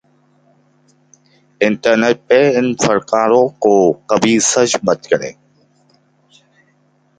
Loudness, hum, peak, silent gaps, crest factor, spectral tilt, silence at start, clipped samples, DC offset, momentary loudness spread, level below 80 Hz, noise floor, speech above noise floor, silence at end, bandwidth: -14 LUFS; none; 0 dBFS; none; 16 dB; -3.5 dB/octave; 1.6 s; under 0.1%; under 0.1%; 5 LU; -56 dBFS; -57 dBFS; 44 dB; 1.85 s; 9.4 kHz